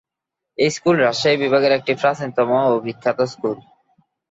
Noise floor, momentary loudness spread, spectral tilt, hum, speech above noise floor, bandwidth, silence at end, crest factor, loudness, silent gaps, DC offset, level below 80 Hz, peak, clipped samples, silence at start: -83 dBFS; 9 LU; -5 dB/octave; none; 65 dB; 8 kHz; 0.7 s; 16 dB; -18 LUFS; none; under 0.1%; -64 dBFS; -4 dBFS; under 0.1%; 0.6 s